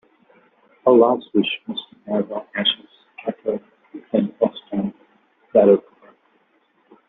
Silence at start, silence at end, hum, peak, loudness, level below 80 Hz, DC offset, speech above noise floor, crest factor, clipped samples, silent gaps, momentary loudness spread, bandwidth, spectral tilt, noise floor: 0.85 s; 1.3 s; none; -2 dBFS; -20 LUFS; -66 dBFS; under 0.1%; 44 dB; 18 dB; under 0.1%; none; 16 LU; 4.1 kHz; -3.5 dB/octave; -62 dBFS